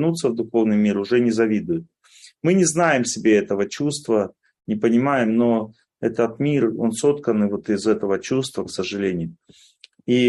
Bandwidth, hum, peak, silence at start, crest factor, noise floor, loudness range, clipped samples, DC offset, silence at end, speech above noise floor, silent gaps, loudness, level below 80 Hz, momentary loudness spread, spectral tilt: 12 kHz; none; -6 dBFS; 0 s; 16 dB; -50 dBFS; 2 LU; under 0.1%; under 0.1%; 0 s; 30 dB; none; -21 LUFS; -62 dBFS; 9 LU; -5.5 dB/octave